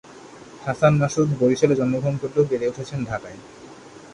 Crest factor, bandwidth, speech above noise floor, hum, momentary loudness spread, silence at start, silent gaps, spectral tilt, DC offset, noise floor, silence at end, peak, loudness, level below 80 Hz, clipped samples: 18 dB; 10.5 kHz; 22 dB; none; 23 LU; 0.1 s; none; -7 dB/octave; under 0.1%; -43 dBFS; 0.05 s; -4 dBFS; -21 LUFS; -54 dBFS; under 0.1%